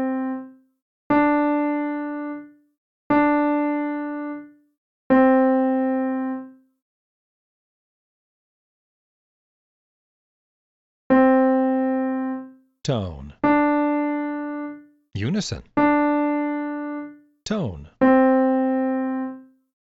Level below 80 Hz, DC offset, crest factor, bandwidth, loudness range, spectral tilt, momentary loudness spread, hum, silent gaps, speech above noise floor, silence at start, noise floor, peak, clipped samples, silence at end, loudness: -54 dBFS; under 0.1%; 18 dB; 8 kHz; 4 LU; -6.5 dB/octave; 17 LU; none; 0.82-1.10 s, 2.78-3.10 s, 4.78-5.10 s, 6.82-11.10 s; over 67 dB; 0 s; under -90 dBFS; -6 dBFS; under 0.1%; 0.55 s; -21 LUFS